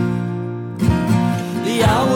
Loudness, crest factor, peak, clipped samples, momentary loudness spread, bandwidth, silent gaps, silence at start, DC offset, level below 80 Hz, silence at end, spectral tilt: -19 LUFS; 12 dB; -6 dBFS; under 0.1%; 9 LU; 16.5 kHz; none; 0 s; under 0.1%; -36 dBFS; 0 s; -6.5 dB/octave